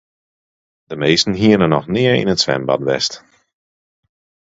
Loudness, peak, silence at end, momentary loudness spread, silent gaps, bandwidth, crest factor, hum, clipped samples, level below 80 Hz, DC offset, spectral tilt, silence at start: -15 LUFS; 0 dBFS; 1.35 s; 8 LU; none; 8 kHz; 18 dB; none; under 0.1%; -48 dBFS; under 0.1%; -5 dB/octave; 0.9 s